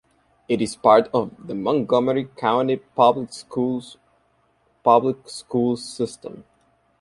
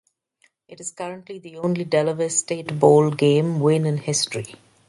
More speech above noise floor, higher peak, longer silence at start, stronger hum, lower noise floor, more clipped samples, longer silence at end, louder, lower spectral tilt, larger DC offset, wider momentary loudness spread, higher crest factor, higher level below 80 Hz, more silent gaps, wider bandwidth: about the same, 43 dB vs 43 dB; about the same, -2 dBFS vs 0 dBFS; second, 0.5 s vs 0.7 s; neither; about the same, -64 dBFS vs -64 dBFS; neither; first, 0.6 s vs 0.35 s; about the same, -21 LUFS vs -20 LUFS; about the same, -6 dB/octave vs -5 dB/octave; neither; second, 13 LU vs 18 LU; about the same, 20 dB vs 20 dB; first, -62 dBFS vs -68 dBFS; neither; about the same, 11.5 kHz vs 11.5 kHz